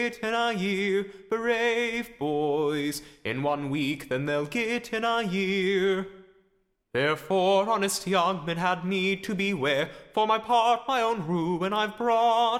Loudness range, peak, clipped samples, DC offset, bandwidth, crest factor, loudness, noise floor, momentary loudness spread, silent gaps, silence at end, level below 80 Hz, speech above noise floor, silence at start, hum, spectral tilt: 2 LU; -12 dBFS; under 0.1%; under 0.1%; 16 kHz; 16 dB; -26 LUFS; -70 dBFS; 7 LU; none; 0 s; -62 dBFS; 44 dB; 0 s; none; -4.5 dB/octave